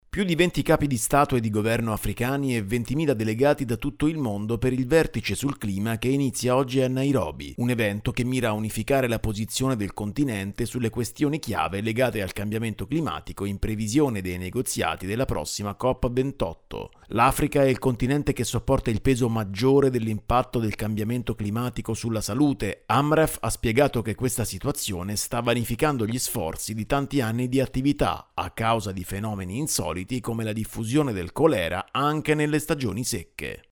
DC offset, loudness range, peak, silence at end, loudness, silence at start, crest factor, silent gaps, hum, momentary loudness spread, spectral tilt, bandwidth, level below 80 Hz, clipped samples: under 0.1%; 3 LU; -4 dBFS; 0.15 s; -25 LUFS; 0.15 s; 20 dB; none; none; 8 LU; -5.5 dB/octave; over 20 kHz; -42 dBFS; under 0.1%